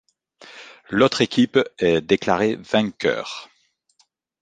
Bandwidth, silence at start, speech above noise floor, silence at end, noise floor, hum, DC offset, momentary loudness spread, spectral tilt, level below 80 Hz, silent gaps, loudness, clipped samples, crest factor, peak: 9.4 kHz; 0.5 s; 45 dB; 0.95 s; -64 dBFS; none; under 0.1%; 18 LU; -5 dB/octave; -56 dBFS; none; -20 LUFS; under 0.1%; 20 dB; -2 dBFS